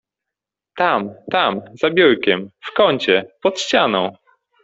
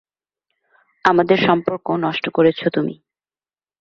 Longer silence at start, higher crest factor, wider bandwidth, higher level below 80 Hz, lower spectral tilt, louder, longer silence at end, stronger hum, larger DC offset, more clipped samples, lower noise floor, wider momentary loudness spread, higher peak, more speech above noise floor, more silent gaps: second, 0.75 s vs 1.05 s; about the same, 16 dB vs 18 dB; first, 8 kHz vs 7 kHz; about the same, -60 dBFS vs -60 dBFS; second, -4 dB/octave vs -7 dB/octave; about the same, -17 LUFS vs -18 LUFS; second, 0.5 s vs 0.85 s; neither; neither; neither; second, -85 dBFS vs under -90 dBFS; about the same, 8 LU vs 7 LU; about the same, -2 dBFS vs -2 dBFS; second, 67 dB vs over 73 dB; neither